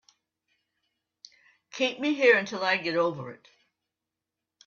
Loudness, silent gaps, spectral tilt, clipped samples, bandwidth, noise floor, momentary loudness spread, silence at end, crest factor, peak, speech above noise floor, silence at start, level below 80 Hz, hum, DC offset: -25 LUFS; none; -4 dB/octave; under 0.1%; 7.2 kHz; -87 dBFS; 20 LU; 1.3 s; 22 dB; -8 dBFS; 61 dB; 1.75 s; -78 dBFS; none; under 0.1%